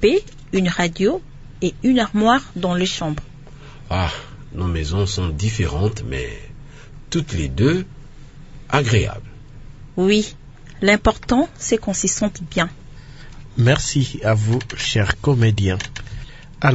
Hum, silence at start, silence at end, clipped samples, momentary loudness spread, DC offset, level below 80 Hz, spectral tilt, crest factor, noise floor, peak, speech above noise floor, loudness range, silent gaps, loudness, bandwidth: none; 0 s; 0 s; under 0.1%; 14 LU; under 0.1%; -36 dBFS; -5 dB/octave; 20 dB; -38 dBFS; 0 dBFS; 20 dB; 4 LU; none; -20 LUFS; 8 kHz